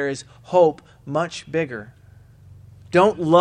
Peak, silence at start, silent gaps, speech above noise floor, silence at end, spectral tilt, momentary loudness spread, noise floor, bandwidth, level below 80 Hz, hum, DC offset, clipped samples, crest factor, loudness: -2 dBFS; 0 s; none; 28 dB; 0 s; -6 dB/octave; 15 LU; -48 dBFS; 10 kHz; -58 dBFS; none; under 0.1%; under 0.1%; 18 dB; -21 LUFS